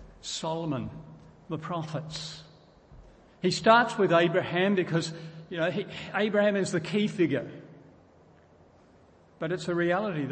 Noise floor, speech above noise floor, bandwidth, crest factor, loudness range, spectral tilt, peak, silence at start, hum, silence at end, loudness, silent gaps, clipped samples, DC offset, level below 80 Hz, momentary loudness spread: -58 dBFS; 31 dB; 8.8 kHz; 24 dB; 7 LU; -5.5 dB/octave; -6 dBFS; 0 s; none; 0 s; -28 LUFS; none; under 0.1%; under 0.1%; -62 dBFS; 16 LU